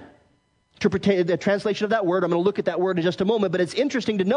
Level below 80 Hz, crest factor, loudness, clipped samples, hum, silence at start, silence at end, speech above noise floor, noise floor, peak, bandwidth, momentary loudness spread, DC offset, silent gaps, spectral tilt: -62 dBFS; 16 dB; -23 LUFS; under 0.1%; none; 0 s; 0 s; 43 dB; -64 dBFS; -8 dBFS; 10.5 kHz; 2 LU; under 0.1%; none; -6.5 dB/octave